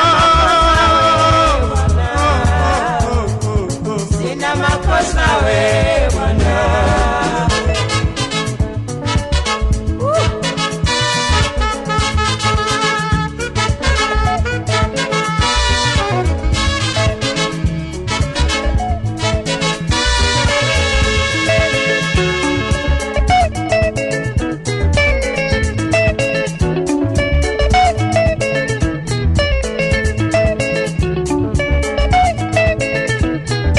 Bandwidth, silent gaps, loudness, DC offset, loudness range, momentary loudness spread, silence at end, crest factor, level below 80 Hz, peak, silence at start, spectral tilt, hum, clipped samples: 11.5 kHz; none; -15 LUFS; under 0.1%; 2 LU; 5 LU; 0 s; 10 dB; -22 dBFS; -4 dBFS; 0 s; -4.5 dB/octave; none; under 0.1%